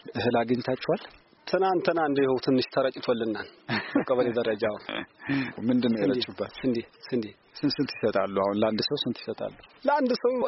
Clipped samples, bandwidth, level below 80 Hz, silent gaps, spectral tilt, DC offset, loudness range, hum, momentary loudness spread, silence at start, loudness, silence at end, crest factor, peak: under 0.1%; 6 kHz; -64 dBFS; none; -4 dB/octave; under 0.1%; 2 LU; none; 9 LU; 0.05 s; -27 LUFS; 0 s; 16 dB; -12 dBFS